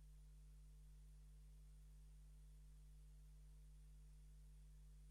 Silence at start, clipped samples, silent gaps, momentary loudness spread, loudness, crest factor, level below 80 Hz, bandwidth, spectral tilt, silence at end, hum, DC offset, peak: 0 s; under 0.1%; none; 0 LU; -67 LUFS; 6 dB; -64 dBFS; 12.5 kHz; -5.5 dB/octave; 0 s; 50 Hz at -65 dBFS; under 0.1%; -58 dBFS